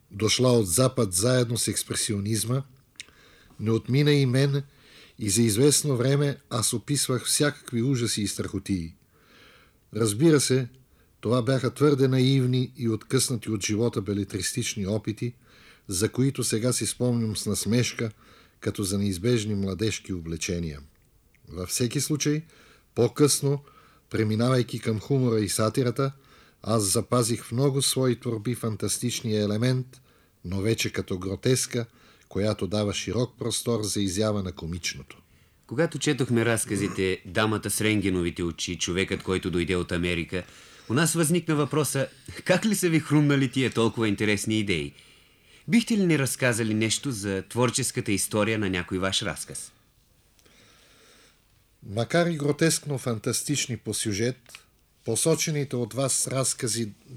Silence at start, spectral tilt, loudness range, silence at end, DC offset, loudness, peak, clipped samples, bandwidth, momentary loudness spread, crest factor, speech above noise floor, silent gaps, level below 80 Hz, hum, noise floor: 0.1 s; -4.5 dB/octave; 5 LU; 0 s; under 0.1%; -25 LUFS; -6 dBFS; under 0.1%; 16.5 kHz; 10 LU; 20 dB; 37 dB; none; -56 dBFS; none; -62 dBFS